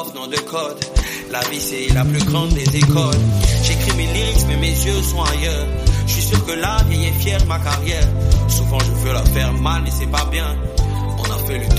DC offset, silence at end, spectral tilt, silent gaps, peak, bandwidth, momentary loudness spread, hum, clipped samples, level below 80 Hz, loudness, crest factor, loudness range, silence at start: under 0.1%; 0 s; -4.5 dB/octave; none; 0 dBFS; 15.5 kHz; 6 LU; none; under 0.1%; -20 dBFS; -18 LUFS; 16 dB; 2 LU; 0 s